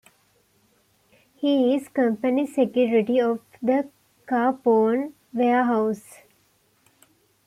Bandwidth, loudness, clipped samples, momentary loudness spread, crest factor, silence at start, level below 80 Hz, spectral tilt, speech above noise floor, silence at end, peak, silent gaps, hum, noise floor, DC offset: 14 kHz; -23 LUFS; under 0.1%; 7 LU; 14 dB; 1.4 s; -72 dBFS; -6.5 dB/octave; 43 dB; 1.5 s; -10 dBFS; none; none; -64 dBFS; under 0.1%